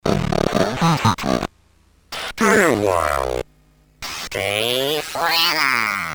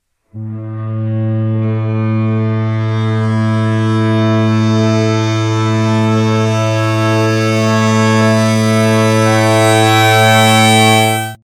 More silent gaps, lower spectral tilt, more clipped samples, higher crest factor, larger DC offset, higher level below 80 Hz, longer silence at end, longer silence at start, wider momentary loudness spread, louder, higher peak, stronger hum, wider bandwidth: neither; second, -4 dB/octave vs -5.5 dB/octave; second, under 0.1% vs 0.1%; first, 20 dB vs 12 dB; neither; first, -40 dBFS vs -54 dBFS; about the same, 0 s vs 0.1 s; second, 0.05 s vs 0.35 s; first, 14 LU vs 8 LU; second, -19 LUFS vs -12 LUFS; about the same, 0 dBFS vs 0 dBFS; neither; first, over 20 kHz vs 18 kHz